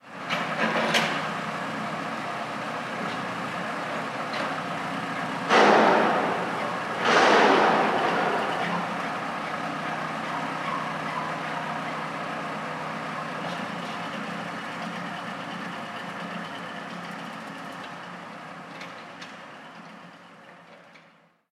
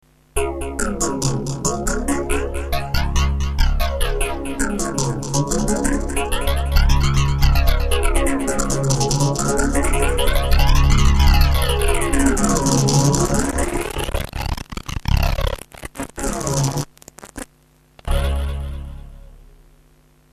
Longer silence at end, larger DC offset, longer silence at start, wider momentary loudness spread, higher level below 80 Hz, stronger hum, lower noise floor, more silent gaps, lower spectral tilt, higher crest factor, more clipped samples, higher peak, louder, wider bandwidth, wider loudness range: second, 0.5 s vs 0.95 s; neither; second, 0.05 s vs 0.35 s; first, 19 LU vs 12 LU; second, -76 dBFS vs -22 dBFS; neither; first, -58 dBFS vs -54 dBFS; neither; about the same, -4 dB/octave vs -4.5 dB/octave; about the same, 22 dB vs 18 dB; neither; second, -6 dBFS vs 0 dBFS; second, -27 LUFS vs -20 LUFS; first, 16 kHz vs 14 kHz; first, 17 LU vs 8 LU